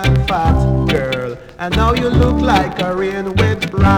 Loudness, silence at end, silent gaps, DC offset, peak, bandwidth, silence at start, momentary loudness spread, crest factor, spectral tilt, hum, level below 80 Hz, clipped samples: -15 LUFS; 0 s; none; under 0.1%; -2 dBFS; 16 kHz; 0 s; 6 LU; 12 dB; -7 dB/octave; none; -22 dBFS; under 0.1%